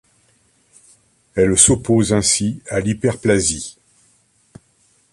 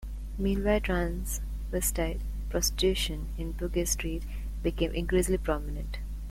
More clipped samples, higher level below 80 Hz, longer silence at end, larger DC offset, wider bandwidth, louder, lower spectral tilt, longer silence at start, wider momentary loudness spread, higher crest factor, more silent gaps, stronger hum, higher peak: neither; second, -42 dBFS vs -34 dBFS; first, 1.4 s vs 0 s; neither; second, 12 kHz vs 16.5 kHz; first, -16 LUFS vs -31 LUFS; about the same, -4 dB/octave vs -4.5 dB/octave; first, 1.35 s vs 0 s; about the same, 12 LU vs 10 LU; about the same, 20 dB vs 16 dB; neither; second, none vs 50 Hz at -35 dBFS; first, 0 dBFS vs -14 dBFS